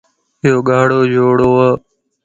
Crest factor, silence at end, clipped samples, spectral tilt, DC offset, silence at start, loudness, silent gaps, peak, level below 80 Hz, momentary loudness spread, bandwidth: 12 dB; 0.45 s; under 0.1%; -7.5 dB/octave; under 0.1%; 0.45 s; -12 LUFS; none; 0 dBFS; -46 dBFS; 5 LU; 7.8 kHz